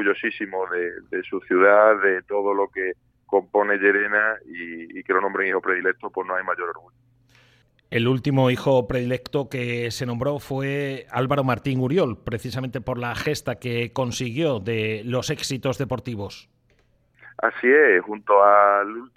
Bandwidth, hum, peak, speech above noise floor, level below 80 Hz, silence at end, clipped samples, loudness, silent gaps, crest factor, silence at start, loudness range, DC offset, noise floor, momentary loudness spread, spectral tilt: 15 kHz; none; -2 dBFS; 40 dB; -54 dBFS; 0.1 s; under 0.1%; -22 LUFS; none; 20 dB; 0 s; 6 LU; under 0.1%; -62 dBFS; 13 LU; -6 dB/octave